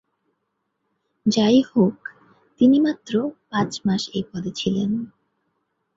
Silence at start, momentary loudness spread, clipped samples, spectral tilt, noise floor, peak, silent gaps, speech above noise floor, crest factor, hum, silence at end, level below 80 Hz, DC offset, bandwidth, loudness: 1.25 s; 12 LU; under 0.1%; -6 dB/octave; -75 dBFS; -4 dBFS; none; 55 dB; 18 dB; none; 0.9 s; -58 dBFS; under 0.1%; 7.8 kHz; -21 LUFS